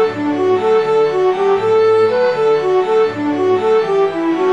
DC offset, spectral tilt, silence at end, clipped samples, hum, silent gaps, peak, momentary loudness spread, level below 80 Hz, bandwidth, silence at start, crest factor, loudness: 0.3%; -6.5 dB/octave; 0 s; under 0.1%; none; none; -4 dBFS; 4 LU; -58 dBFS; 8.4 kHz; 0 s; 10 dB; -14 LUFS